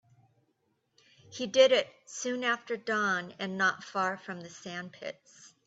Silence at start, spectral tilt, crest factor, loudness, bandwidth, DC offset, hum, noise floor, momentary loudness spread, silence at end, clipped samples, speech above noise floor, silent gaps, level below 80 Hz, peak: 1.3 s; -3 dB/octave; 22 dB; -30 LUFS; 8 kHz; under 0.1%; none; -76 dBFS; 18 LU; 0.2 s; under 0.1%; 45 dB; none; -80 dBFS; -10 dBFS